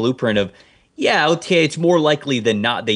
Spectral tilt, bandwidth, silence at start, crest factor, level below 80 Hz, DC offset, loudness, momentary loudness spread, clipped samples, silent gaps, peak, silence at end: -5 dB/octave; 10.5 kHz; 0 s; 16 dB; -58 dBFS; under 0.1%; -17 LUFS; 6 LU; under 0.1%; none; -2 dBFS; 0 s